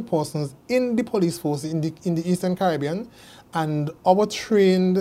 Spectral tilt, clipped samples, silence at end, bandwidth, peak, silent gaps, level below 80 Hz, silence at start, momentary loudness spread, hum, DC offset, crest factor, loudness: -6.5 dB/octave; under 0.1%; 0 s; 15.5 kHz; -4 dBFS; none; -60 dBFS; 0 s; 10 LU; none; under 0.1%; 18 dB; -23 LUFS